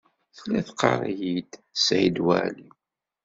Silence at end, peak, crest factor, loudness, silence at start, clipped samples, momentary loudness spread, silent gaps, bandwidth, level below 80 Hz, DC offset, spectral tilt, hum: 0.6 s; -4 dBFS; 22 dB; -25 LUFS; 0.35 s; under 0.1%; 12 LU; none; 8 kHz; -62 dBFS; under 0.1%; -3.5 dB/octave; none